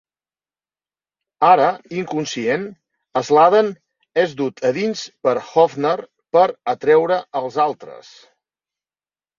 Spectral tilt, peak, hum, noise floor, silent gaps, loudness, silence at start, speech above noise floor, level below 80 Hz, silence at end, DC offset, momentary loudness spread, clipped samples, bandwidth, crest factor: -5 dB/octave; -2 dBFS; none; under -90 dBFS; none; -18 LUFS; 1.4 s; over 73 dB; -68 dBFS; 1.4 s; under 0.1%; 11 LU; under 0.1%; 7.4 kHz; 18 dB